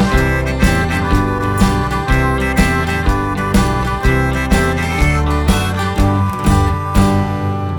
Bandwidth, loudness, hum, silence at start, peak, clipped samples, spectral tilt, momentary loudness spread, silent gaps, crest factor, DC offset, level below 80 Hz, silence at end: 19 kHz; -15 LUFS; none; 0 s; 0 dBFS; under 0.1%; -6 dB/octave; 3 LU; none; 14 dB; under 0.1%; -20 dBFS; 0 s